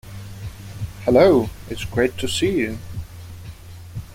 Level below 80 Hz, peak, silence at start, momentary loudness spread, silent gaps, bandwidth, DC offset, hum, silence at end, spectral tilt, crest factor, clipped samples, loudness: -42 dBFS; -2 dBFS; 0.05 s; 23 LU; none; 16.5 kHz; under 0.1%; none; 0 s; -5.5 dB/octave; 20 dB; under 0.1%; -19 LUFS